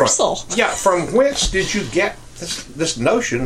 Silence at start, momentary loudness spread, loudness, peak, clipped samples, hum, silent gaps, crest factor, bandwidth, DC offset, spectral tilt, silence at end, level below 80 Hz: 0 s; 10 LU; -18 LUFS; 0 dBFS; under 0.1%; none; none; 18 dB; 15.5 kHz; under 0.1%; -3 dB/octave; 0 s; -36 dBFS